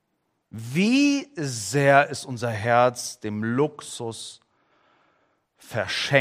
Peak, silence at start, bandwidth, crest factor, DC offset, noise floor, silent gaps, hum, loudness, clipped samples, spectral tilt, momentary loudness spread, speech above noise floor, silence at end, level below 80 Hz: -2 dBFS; 0.55 s; 16 kHz; 22 dB; under 0.1%; -74 dBFS; none; none; -23 LUFS; under 0.1%; -4.5 dB/octave; 15 LU; 51 dB; 0 s; -68 dBFS